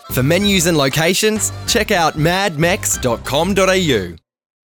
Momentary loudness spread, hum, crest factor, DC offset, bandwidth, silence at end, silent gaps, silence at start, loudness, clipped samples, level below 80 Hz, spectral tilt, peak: 5 LU; none; 12 dB; under 0.1%; over 20 kHz; 0.55 s; none; 0.05 s; -15 LUFS; under 0.1%; -36 dBFS; -3.5 dB/octave; -4 dBFS